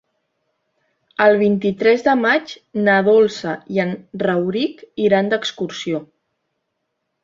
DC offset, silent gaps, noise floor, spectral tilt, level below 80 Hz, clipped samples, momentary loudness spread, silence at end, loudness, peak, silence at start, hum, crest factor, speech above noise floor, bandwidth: under 0.1%; none; -74 dBFS; -6 dB/octave; -62 dBFS; under 0.1%; 11 LU; 1.2 s; -18 LUFS; -2 dBFS; 1.2 s; none; 18 dB; 57 dB; 7.6 kHz